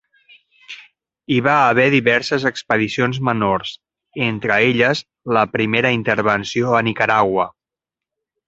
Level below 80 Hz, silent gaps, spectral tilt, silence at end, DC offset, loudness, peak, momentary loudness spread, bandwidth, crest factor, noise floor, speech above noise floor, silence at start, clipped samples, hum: -54 dBFS; none; -5.5 dB/octave; 1 s; under 0.1%; -17 LUFS; 0 dBFS; 11 LU; 8.2 kHz; 18 dB; -87 dBFS; 70 dB; 0.7 s; under 0.1%; none